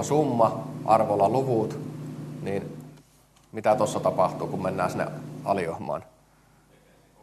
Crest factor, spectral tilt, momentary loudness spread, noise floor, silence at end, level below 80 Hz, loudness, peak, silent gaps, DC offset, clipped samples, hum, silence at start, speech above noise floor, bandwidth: 22 dB; -6.5 dB/octave; 14 LU; -59 dBFS; 1.2 s; -64 dBFS; -26 LUFS; -6 dBFS; none; under 0.1%; under 0.1%; none; 0 s; 34 dB; 13 kHz